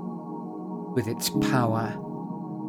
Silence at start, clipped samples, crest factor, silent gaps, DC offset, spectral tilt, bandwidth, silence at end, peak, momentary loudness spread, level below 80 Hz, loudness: 0 s; under 0.1%; 18 dB; none; under 0.1%; -5.5 dB/octave; 20 kHz; 0 s; -10 dBFS; 12 LU; -60 dBFS; -29 LUFS